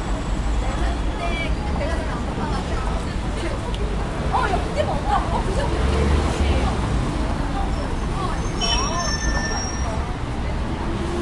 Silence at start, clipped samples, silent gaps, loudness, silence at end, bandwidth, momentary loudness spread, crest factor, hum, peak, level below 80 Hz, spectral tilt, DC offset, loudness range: 0 s; under 0.1%; none; -24 LUFS; 0 s; 11.5 kHz; 5 LU; 14 dB; none; -8 dBFS; -26 dBFS; -5 dB/octave; under 0.1%; 3 LU